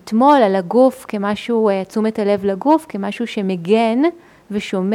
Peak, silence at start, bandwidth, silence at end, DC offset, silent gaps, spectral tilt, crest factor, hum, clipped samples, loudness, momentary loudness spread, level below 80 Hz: -2 dBFS; 0.05 s; 15 kHz; 0 s; under 0.1%; none; -6.5 dB/octave; 16 dB; none; under 0.1%; -17 LUFS; 10 LU; -60 dBFS